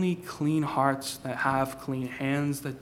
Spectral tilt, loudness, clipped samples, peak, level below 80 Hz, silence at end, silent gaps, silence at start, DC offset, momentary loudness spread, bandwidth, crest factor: -5.5 dB/octave; -29 LUFS; under 0.1%; -10 dBFS; -60 dBFS; 0 s; none; 0 s; under 0.1%; 7 LU; 16.5 kHz; 20 dB